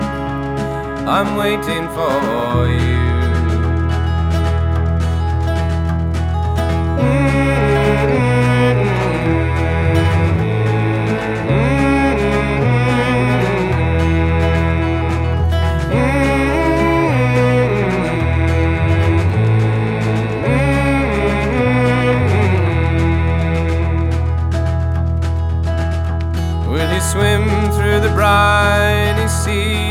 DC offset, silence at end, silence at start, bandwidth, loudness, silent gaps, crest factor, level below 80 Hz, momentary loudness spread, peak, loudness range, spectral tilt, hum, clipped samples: under 0.1%; 0 s; 0 s; 14.5 kHz; -16 LUFS; none; 14 dB; -24 dBFS; 5 LU; 0 dBFS; 3 LU; -6.5 dB/octave; none; under 0.1%